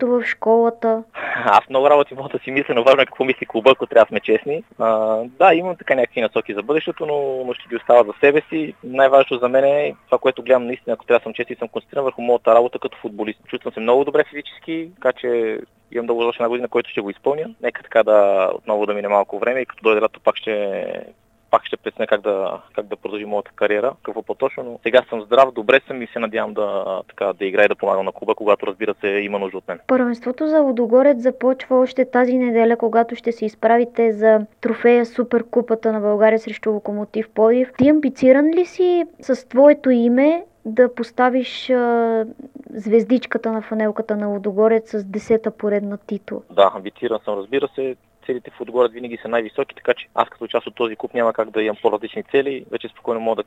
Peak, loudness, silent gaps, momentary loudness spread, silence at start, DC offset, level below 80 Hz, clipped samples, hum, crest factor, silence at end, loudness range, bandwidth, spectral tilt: 0 dBFS; -18 LUFS; none; 12 LU; 0 s; under 0.1%; -64 dBFS; under 0.1%; none; 18 dB; 0.05 s; 6 LU; 8 kHz; -6.5 dB/octave